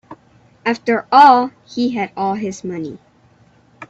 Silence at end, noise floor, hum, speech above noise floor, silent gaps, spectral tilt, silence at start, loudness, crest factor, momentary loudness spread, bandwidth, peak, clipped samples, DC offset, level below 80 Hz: 0.05 s; -52 dBFS; none; 37 dB; none; -5 dB/octave; 0.1 s; -15 LUFS; 18 dB; 17 LU; 8 kHz; 0 dBFS; under 0.1%; under 0.1%; -62 dBFS